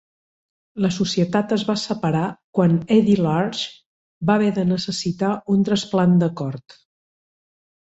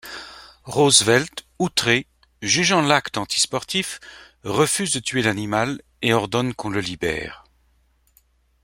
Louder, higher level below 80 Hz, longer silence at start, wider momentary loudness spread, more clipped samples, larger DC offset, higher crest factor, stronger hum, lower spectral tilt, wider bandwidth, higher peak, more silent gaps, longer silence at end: about the same, -20 LUFS vs -20 LUFS; about the same, -56 dBFS vs -54 dBFS; first, 0.75 s vs 0.05 s; second, 10 LU vs 16 LU; neither; neither; about the same, 18 dB vs 22 dB; neither; first, -6.5 dB/octave vs -3 dB/octave; second, 8.2 kHz vs 16.5 kHz; second, -4 dBFS vs 0 dBFS; first, 2.44-2.53 s, 3.86-4.21 s vs none; about the same, 1.3 s vs 1.25 s